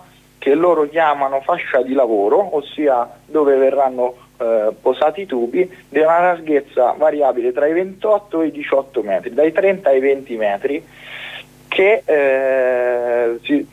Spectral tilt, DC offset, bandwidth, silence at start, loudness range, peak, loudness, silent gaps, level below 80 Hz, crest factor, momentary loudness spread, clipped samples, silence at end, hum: -6 dB/octave; under 0.1%; 13 kHz; 0.4 s; 1 LU; -4 dBFS; -17 LUFS; none; -60 dBFS; 12 dB; 8 LU; under 0.1%; 0.05 s; 50 Hz at -55 dBFS